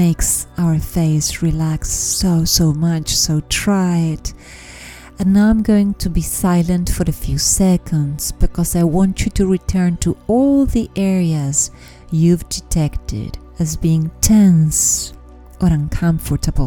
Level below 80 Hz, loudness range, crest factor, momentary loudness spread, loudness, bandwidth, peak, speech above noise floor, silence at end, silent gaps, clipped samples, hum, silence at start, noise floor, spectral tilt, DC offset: -26 dBFS; 2 LU; 16 dB; 9 LU; -16 LUFS; 19 kHz; 0 dBFS; 21 dB; 0 s; none; under 0.1%; none; 0 s; -36 dBFS; -5 dB/octave; under 0.1%